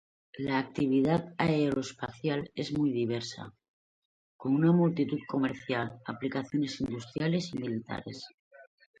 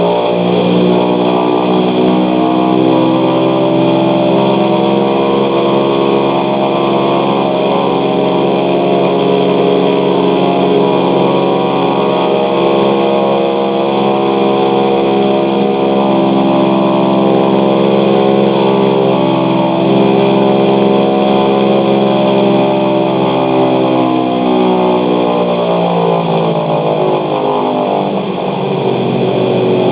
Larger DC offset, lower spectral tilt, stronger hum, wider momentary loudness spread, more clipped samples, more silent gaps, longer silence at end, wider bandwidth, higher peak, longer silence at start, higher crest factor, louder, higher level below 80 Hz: neither; second, -7 dB/octave vs -11 dB/octave; neither; first, 13 LU vs 3 LU; neither; first, 3.68-4.39 s, 8.34-8.51 s vs none; first, 0.35 s vs 0 s; first, 9.2 kHz vs 4 kHz; second, -12 dBFS vs 0 dBFS; first, 0.35 s vs 0 s; first, 18 dB vs 10 dB; second, -31 LUFS vs -11 LUFS; second, -64 dBFS vs -54 dBFS